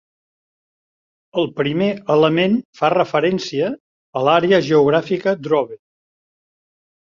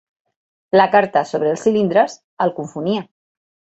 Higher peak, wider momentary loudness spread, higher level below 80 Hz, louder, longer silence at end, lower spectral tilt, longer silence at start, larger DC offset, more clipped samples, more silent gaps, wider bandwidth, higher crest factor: about the same, -2 dBFS vs -2 dBFS; about the same, 9 LU vs 9 LU; about the same, -60 dBFS vs -64 dBFS; about the same, -17 LUFS vs -18 LUFS; first, 1.3 s vs 0.75 s; about the same, -6.5 dB/octave vs -6 dB/octave; first, 1.35 s vs 0.75 s; neither; neither; first, 2.65-2.73 s, 3.80-4.13 s vs 2.24-2.37 s; second, 7.4 kHz vs 8.2 kHz; about the same, 18 dB vs 18 dB